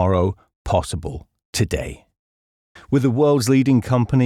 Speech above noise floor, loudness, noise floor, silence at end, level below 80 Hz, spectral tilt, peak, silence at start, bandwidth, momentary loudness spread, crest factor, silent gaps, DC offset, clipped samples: over 72 dB; -20 LUFS; under -90 dBFS; 0 s; -40 dBFS; -6.5 dB/octave; -6 dBFS; 0 s; 15.5 kHz; 16 LU; 14 dB; 0.56-0.65 s, 1.45-1.53 s, 2.19-2.75 s; under 0.1%; under 0.1%